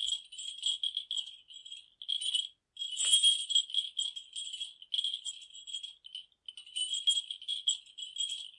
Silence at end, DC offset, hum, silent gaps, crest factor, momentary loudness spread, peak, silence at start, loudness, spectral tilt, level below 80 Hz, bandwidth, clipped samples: 0.1 s; under 0.1%; none; none; 24 dB; 20 LU; -12 dBFS; 0 s; -31 LUFS; 6.5 dB/octave; -84 dBFS; 11.5 kHz; under 0.1%